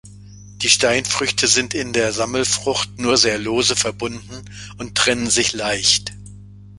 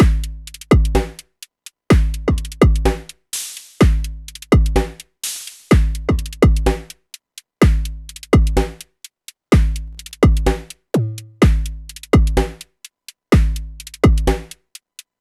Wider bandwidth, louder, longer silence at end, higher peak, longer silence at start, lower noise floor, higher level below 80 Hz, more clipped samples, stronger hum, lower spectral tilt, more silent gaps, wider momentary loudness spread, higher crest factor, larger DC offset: second, 11.5 kHz vs 13.5 kHz; about the same, -17 LUFS vs -18 LUFS; second, 0 s vs 0.75 s; about the same, 0 dBFS vs 0 dBFS; about the same, 0.05 s vs 0 s; about the same, -40 dBFS vs -42 dBFS; second, -46 dBFS vs -20 dBFS; neither; first, 50 Hz at -35 dBFS vs none; second, -1.5 dB/octave vs -6.5 dB/octave; neither; second, 14 LU vs 22 LU; about the same, 20 dB vs 16 dB; neither